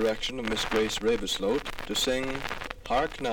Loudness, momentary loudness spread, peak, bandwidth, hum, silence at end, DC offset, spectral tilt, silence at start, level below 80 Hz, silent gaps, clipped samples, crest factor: -29 LUFS; 6 LU; -12 dBFS; 19.5 kHz; none; 0 s; under 0.1%; -3 dB/octave; 0 s; -44 dBFS; none; under 0.1%; 16 dB